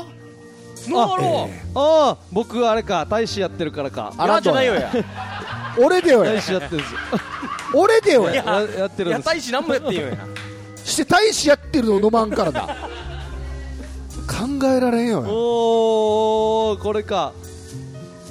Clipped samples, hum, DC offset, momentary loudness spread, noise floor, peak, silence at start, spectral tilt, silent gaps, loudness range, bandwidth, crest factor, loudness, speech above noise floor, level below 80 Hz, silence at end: under 0.1%; none; under 0.1%; 17 LU; -41 dBFS; -4 dBFS; 0 s; -4.5 dB/octave; none; 3 LU; 15 kHz; 14 dB; -19 LUFS; 23 dB; -40 dBFS; 0 s